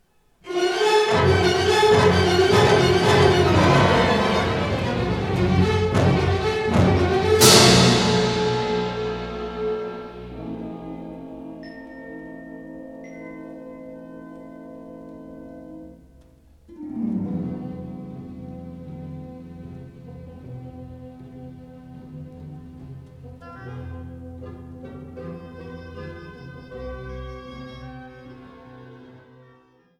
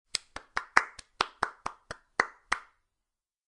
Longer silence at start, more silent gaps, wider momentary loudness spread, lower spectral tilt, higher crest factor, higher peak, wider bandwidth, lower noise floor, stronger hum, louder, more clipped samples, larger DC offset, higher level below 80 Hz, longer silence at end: first, 0.45 s vs 0.15 s; neither; first, 24 LU vs 14 LU; first, -4.5 dB/octave vs -1 dB/octave; second, 20 dB vs 34 dB; about the same, -2 dBFS vs -2 dBFS; first, 18 kHz vs 11.5 kHz; second, -56 dBFS vs -88 dBFS; neither; first, -18 LUFS vs -32 LUFS; neither; neither; first, -42 dBFS vs -62 dBFS; first, 1.05 s vs 0.85 s